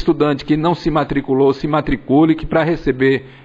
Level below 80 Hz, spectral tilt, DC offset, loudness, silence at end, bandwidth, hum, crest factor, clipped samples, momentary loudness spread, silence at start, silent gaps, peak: -34 dBFS; -8.5 dB/octave; under 0.1%; -16 LUFS; 0.15 s; 7.6 kHz; none; 14 dB; under 0.1%; 4 LU; 0 s; none; -2 dBFS